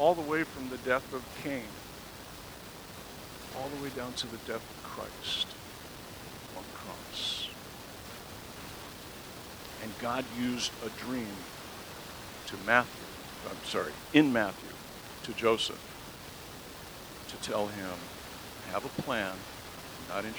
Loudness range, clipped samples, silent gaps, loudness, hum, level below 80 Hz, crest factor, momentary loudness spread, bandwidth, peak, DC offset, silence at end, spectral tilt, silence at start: 9 LU; under 0.1%; none; -36 LUFS; none; -58 dBFS; 28 dB; 16 LU; over 20 kHz; -8 dBFS; under 0.1%; 0 s; -3.5 dB/octave; 0 s